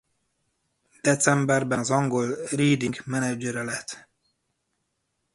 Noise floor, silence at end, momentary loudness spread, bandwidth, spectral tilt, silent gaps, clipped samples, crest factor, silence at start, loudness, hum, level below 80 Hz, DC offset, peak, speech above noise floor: -77 dBFS; 1.35 s; 10 LU; 11.5 kHz; -5 dB/octave; none; under 0.1%; 22 dB; 1.05 s; -24 LUFS; none; -64 dBFS; under 0.1%; -6 dBFS; 53 dB